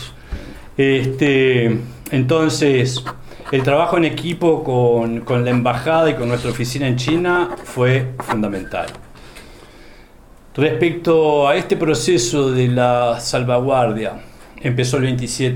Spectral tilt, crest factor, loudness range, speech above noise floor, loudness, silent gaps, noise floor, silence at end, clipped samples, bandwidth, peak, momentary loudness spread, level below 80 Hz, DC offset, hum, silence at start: -5.5 dB/octave; 16 dB; 5 LU; 27 dB; -17 LUFS; none; -43 dBFS; 0 s; under 0.1%; 15.5 kHz; -2 dBFS; 11 LU; -42 dBFS; under 0.1%; none; 0 s